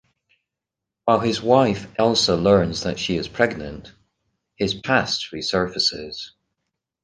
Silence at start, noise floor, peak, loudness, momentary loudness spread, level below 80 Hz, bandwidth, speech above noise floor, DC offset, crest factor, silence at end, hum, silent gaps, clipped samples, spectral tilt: 1.05 s; -85 dBFS; -2 dBFS; -20 LUFS; 15 LU; -48 dBFS; 10 kHz; 65 dB; under 0.1%; 20 dB; 0.75 s; none; none; under 0.1%; -4.5 dB/octave